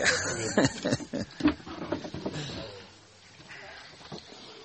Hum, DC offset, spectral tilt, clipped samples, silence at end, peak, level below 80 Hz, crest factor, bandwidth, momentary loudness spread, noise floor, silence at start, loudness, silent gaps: none; under 0.1%; -3.5 dB/octave; under 0.1%; 0 s; -8 dBFS; -56 dBFS; 24 dB; 8.6 kHz; 21 LU; -54 dBFS; 0 s; -31 LUFS; none